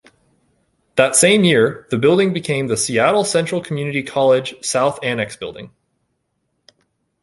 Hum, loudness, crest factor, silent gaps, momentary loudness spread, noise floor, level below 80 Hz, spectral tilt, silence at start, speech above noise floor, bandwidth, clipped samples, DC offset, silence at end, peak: none; -16 LUFS; 18 dB; none; 11 LU; -70 dBFS; -58 dBFS; -4 dB/octave; 0.95 s; 54 dB; 11.5 kHz; under 0.1%; under 0.1%; 1.55 s; 0 dBFS